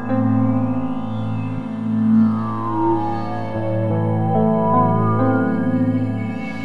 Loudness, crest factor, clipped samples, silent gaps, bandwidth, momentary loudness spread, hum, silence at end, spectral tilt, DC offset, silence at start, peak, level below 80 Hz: -19 LUFS; 14 dB; under 0.1%; none; 4.9 kHz; 8 LU; none; 0 s; -10.5 dB/octave; 3%; 0 s; -4 dBFS; -52 dBFS